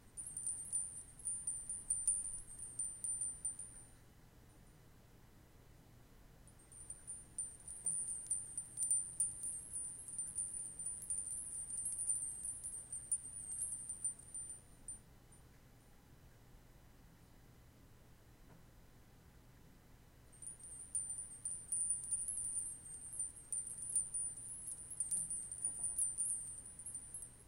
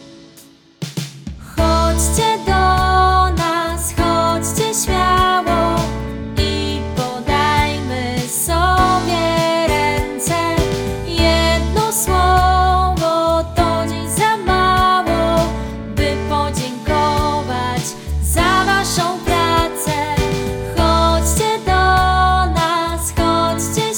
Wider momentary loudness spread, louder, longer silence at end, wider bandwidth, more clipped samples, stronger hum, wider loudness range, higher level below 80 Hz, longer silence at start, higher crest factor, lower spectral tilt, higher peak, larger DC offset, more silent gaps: first, 12 LU vs 8 LU; second, -41 LUFS vs -16 LUFS; about the same, 0 s vs 0 s; second, 16.5 kHz vs over 20 kHz; neither; neither; first, 14 LU vs 2 LU; second, -66 dBFS vs -24 dBFS; about the same, 0 s vs 0 s; first, 22 dB vs 16 dB; second, -1.5 dB/octave vs -4 dB/octave; second, -24 dBFS vs 0 dBFS; neither; neither